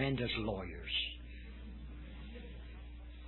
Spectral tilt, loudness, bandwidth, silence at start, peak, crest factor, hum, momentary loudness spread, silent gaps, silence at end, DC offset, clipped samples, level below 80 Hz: -8 dB/octave; -41 LUFS; 4.3 kHz; 0 s; -20 dBFS; 22 dB; none; 15 LU; none; 0 s; under 0.1%; under 0.1%; -48 dBFS